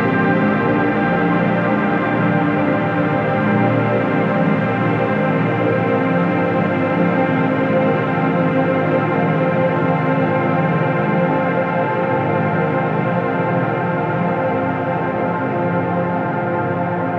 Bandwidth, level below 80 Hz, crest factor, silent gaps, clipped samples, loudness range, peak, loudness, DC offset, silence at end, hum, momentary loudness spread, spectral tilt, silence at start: 5.6 kHz; -52 dBFS; 14 dB; none; under 0.1%; 2 LU; -4 dBFS; -17 LUFS; under 0.1%; 0 s; none; 3 LU; -9.5 dB/octave; 0 s